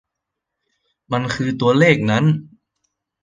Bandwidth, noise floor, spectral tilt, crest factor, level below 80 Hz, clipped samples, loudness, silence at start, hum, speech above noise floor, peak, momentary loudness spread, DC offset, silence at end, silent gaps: 9.4 kHz; -81 dBFS; -6.5 dB/octave; 18 dB; -54 dBFS; under 0.1%; -17 LUFS; 1.1 s; none; 65 dB; -2 dBFS; 10 LU; under 0.1%; 0.75 s; none